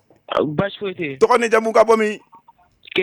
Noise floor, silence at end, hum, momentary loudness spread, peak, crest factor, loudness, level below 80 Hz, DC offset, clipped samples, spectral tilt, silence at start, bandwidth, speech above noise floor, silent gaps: -52 dBFS; 0 s; none; 11 LU; -4 dBFS; 16 dB; -18 LUFS; -54 dBFS; under 0.1%; under 0.1%; -5 dB/octave; 0.3 s; 13.5 kHz; 35 dB; none